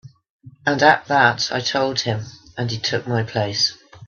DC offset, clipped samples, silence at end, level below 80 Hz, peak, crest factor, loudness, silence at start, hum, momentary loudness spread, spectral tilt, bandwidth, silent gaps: under 0.1%; under 0.1%; 0 s; -58 dBFS; 0 dBFS; 20 dB; -19 LUFS; 0.05 s; none; 11 LU; -4 dB/octave; 7.2 kHz; 0.30-0.40 s